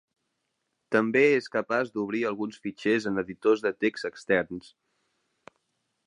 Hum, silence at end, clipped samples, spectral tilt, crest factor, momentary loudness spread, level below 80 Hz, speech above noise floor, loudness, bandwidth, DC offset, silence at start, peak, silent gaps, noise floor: none; 1.45 s; under 0.1%; -6 dB/octave; 22 dB; 12 LU; -68 dBFS; 53 dB; -27 LUFS; 10.5 kHz; under 0.1%; 0.9 s; -8 dBFS; none; -79 dBFS